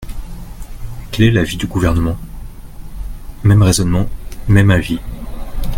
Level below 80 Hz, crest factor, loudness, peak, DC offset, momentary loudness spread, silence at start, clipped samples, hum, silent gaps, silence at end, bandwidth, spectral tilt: -26 dBFS; 16 dB; -15 LUFS; 0 dBFS; under 0.1%; 22 LU; 0 s; under 0.1%; none; none; 0 s; 16.5 kHz; -6 dB/octave